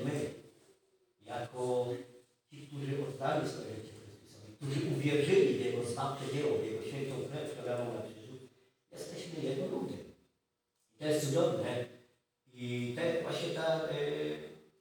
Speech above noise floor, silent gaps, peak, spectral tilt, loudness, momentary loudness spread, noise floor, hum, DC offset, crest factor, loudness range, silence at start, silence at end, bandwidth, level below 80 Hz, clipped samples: 49 dB; none; -16 dBFS; -6 dB/octave; -36 LUFS; 20 LU; -82 dBFS; none; under 0.1%; 20 dB; 7 LU; 0 s; 0.2 s; over 20 kHz; -78 dBFS; under 0.1%